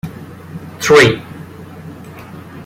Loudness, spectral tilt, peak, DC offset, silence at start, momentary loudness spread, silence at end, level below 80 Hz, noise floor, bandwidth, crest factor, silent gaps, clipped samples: -11 LUFS; -4.5 dB/octave; 0 dBFS; under 0.1%; 0.05 s; 25 LU; 0.05 s; -48 dBFS; -33 dBFS; 16 kHz; 16 dB; none; under 0.1%